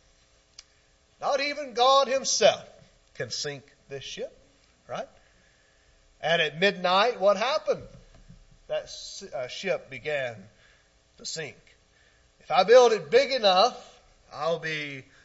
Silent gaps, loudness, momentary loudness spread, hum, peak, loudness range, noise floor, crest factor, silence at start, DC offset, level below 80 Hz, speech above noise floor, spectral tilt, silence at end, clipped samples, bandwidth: none; -25 LUFS; 18 LU; none; -6 dBFS; 12 LU; -63 dBFS; 22 dB; 1.2 s; under 0.1%; -64 dBFS; 38 dB; -2.5 dB/octave; 0.25 s; under 0.1%; 8 kHz